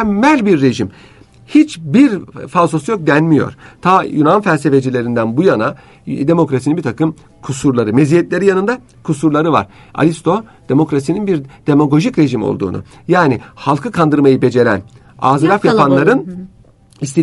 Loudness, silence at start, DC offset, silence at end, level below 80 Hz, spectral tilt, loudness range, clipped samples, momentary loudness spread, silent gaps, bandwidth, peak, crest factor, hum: -13 LUFS; 0 s; under 0.1%; 0 s; -48 dBFS; -7 dB/octave; 2 LU; under 0.1%; 10 LU; none; 11.5 kHz; 0 dBFS; 14 dB; none